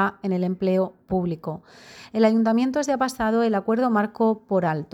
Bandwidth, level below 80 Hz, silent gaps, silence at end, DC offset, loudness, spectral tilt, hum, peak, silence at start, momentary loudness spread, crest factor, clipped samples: 15 kHz; -56 dBFS; none; 0.1 s; under 0.1%; -23 LUFS; -6.5 dB/octave; none; -8 dBFS; 0 s; 8 LU; 14 dB; under 0.1%